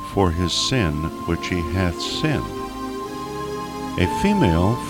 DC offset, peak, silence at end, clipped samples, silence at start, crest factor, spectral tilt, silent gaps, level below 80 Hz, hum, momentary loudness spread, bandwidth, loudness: under 0.1%; -4 dBFS; 0 s; under 0.1%; 0 s; 18 dB; -5.5 dB/octave; none; -36 dBFS; none; 11 LU; 17 kHz; -22 LUFS